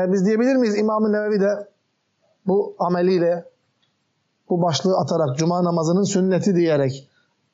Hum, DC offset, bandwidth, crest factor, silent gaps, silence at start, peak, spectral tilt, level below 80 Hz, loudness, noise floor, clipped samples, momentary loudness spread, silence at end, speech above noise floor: none; under 0.1%; 8 kHz; 12 dB; none; 0 s; -8 dBFS; -6.5 dB/octave; -72 dBFS; -20 LUFS; -70 dBFS; under 0.1%; 6 LU; 0.55 s; 51 dB